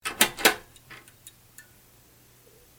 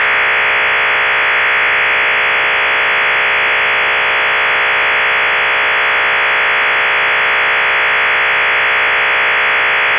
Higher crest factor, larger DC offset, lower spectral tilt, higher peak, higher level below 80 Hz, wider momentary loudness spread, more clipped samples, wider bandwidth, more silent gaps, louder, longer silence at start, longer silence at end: first, 30 dB vs 8 dB; neither; second, -0.5 dB/octave vs -4 dB/octave; about the same, -2 dBFS vs -4 dBFS; second, -60 dBFS vs -48 dBFS; first, 27 LU vs 1 LU; neither; first, 17.5 kHz vs 4 kHz; neither; second, -23 LUFS vs -10 LUFS; about the same, 0.05 s vs 0 s; first, 1.5 s vs 0 s